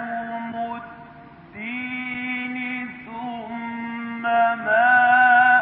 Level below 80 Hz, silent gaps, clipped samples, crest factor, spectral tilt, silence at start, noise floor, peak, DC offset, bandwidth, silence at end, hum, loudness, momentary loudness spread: -66 dBFS; none; under 0.1%; 16 dB; -8.5 dB/octave; 0 s; -44 dBFS; -6 dBFS; under 0.1%; 4 kHz; 0 s; none; -21 LUFS; 19 LU